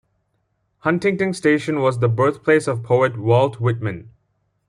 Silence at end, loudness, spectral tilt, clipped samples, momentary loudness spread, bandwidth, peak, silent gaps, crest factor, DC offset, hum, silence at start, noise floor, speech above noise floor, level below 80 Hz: 0.6 s; -19 LUFS; -7 dB/octave; under 0.1%; 7 LU; 11 kHz; -2 dBFS; none; 16 dB; under 0.1%; none; 0.85 s; -69 dBFS; 51 dB; -58 dBFS